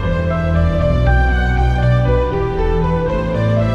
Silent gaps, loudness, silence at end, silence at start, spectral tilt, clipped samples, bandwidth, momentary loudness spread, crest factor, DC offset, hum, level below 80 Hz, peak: none; -16 LUFS; 0 s; 0 s; -8.5 dB/octave; under 0.1%; 7.2 kHz; 4 LU; 12 dB; under 0.1%; none; -18 dBFS; -2 dBFS